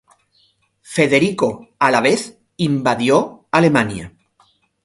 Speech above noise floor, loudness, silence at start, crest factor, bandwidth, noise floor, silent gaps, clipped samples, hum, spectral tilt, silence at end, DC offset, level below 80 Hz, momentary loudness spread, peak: 44 dB; -17 LUFS; 0.9 s; 18 dB; 11.5 kHz; -60 dBFS; none; under 0.1%; none; -5.5 dB/octave; 0.75 s; under 0.1%; -52 dBFS; 9 LU; 0 dBFS